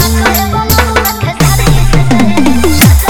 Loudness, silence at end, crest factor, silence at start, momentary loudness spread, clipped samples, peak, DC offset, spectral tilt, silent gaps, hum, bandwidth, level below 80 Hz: -9 LUFS; 0 s; 8 dB; 0 s; 4 LU; 2%; 0 dBFS; under 0.1%; -5 dB/octave; none; none; over 20 kHz; -14 dBFS